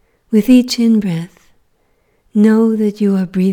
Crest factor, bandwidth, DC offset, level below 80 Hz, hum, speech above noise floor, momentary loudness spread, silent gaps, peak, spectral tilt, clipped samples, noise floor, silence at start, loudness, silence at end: 14 dB; 17 kHz; under 0.1%; -50 dBFS; none; 47 dB; 10 LU; none; 0 dBFS; -6.5 dB/octave; under 0.1%; -59 dBFS; 0.3 s; -13 LUFS; 0 s